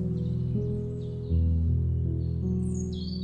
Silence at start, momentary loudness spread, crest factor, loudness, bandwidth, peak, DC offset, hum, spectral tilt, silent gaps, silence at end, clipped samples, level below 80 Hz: 0 s; 6 LU; 12 dB; -29 LUFS; 9 kHz; -16 dBFS; under 0.1%; none; -9 dB/octave; none; 0 s; under 0.1%; -34 dBFS